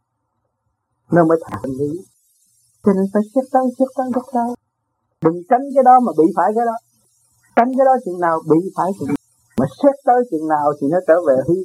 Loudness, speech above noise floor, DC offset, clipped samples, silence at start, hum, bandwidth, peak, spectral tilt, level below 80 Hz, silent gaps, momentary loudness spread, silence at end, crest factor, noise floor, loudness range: -17 LUFS; 56 dB; under 0.1%; under 0.1%; 1.1 s; none; 13 kHz; 0 dBFS; -8.5 dB/octave; -58 dBFS; none; 10 LU; 0 s; 18 dB; -71 dBFS; 5 LU